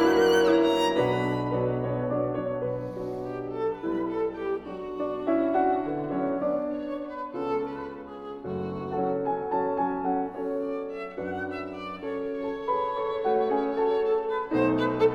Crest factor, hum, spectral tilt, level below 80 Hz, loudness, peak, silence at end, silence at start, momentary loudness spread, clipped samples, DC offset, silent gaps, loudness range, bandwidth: 18 dB; none; -6.5 dB/octave; -58 dBFS; -28 LUFS; -10 dBFS; 0 s; 0 s; 10 LU; under 0.1%; under 0.1%; none; 4 LU; 16 kHz